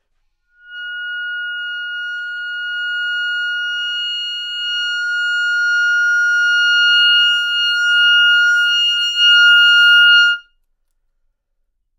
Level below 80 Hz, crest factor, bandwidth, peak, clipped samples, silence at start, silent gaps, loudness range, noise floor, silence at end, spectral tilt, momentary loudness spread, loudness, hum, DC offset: -64 dBFS; 14 dB; 13.5 kHz; -2 dBFS; under 0.1%; 0.7 s; none; 11 LU; -68 dBFS; 1.6 s; 8.5 dB/octave; 16 LU; -13 LUFS; none; under 0.1%